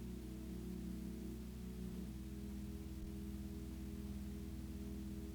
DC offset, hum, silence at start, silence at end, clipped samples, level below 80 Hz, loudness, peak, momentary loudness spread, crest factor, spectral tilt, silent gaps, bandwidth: under 0.1%; none; 0 s; 0 s; under 0.1%; -52 dBFS; -49 LUFS; -36 dBFS; 2 LU; 12 dB; -7 dB/octave; none; over 20 kHz